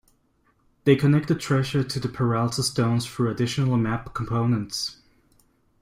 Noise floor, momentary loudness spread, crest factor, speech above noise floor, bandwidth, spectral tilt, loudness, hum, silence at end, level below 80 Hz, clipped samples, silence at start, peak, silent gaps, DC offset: -65 dBFS; 8 LU; 18 dB; 43 dB; 15.5 kHz; -6 dB/octave; -24 LUFS; none; 0.9 s; -52 dBFS; under 0.1%; 0.85 s; -6 dBFS; none; under 0.1%